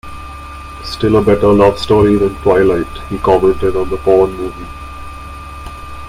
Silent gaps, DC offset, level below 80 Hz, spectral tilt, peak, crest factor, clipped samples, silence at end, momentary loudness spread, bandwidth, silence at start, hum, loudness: none; under 0.1%; -30 dBFS; -7 dB/octave; 0 dBFS; 14 dB; under 0.1%; 0 s; 19 LU; 15 kHz; 0.05 s; none; -12 LUFS